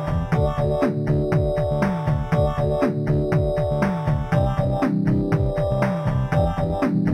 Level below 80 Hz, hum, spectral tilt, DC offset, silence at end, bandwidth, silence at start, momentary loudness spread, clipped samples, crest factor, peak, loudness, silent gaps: -32 dBFS; none; -9 dB/octave; under 0.1%; 0 s; 10 kHz; 0 s; 2 LU; under 0.1%; 14 dB; -6 dBFS; -22 LUFS; none